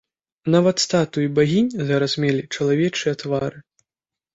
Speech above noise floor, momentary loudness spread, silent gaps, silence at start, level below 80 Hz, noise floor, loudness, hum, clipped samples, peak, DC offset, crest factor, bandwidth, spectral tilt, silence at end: 70 dB; 7 LU; none; 0.45 s; -58 dBFS; -89 dBFS; -20 LUFS; none; under 0.1%; -4 dBFS; under 0.1%; 16 dB; 8 kHz; -5.5 dB/octave; 0.75 s